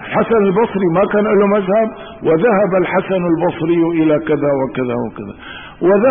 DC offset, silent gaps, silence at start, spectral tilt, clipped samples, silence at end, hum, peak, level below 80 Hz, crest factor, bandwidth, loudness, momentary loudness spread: 0.3%; none; 0 s; -12.5 dB/octave; under 0.1%; 0 s; none; -4 dBFS; -48 dBFS; 10 dB; 3.7 kHz; -15 LUFS; 9 LU